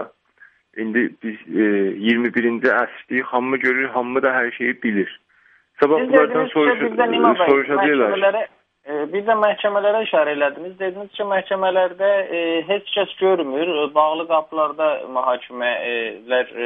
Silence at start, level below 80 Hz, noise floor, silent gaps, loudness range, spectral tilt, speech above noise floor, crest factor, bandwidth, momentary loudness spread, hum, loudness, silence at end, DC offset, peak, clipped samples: 0 s; -70 dBFS; -56 dBFS; none; 3 LU; -7.5 dB/octave; 37 dB; 18 dB; 5.2 kHz; 9 LU; none; -19 LUFS; 0 s; under 0.1%; 0 dBFS; under 0.1%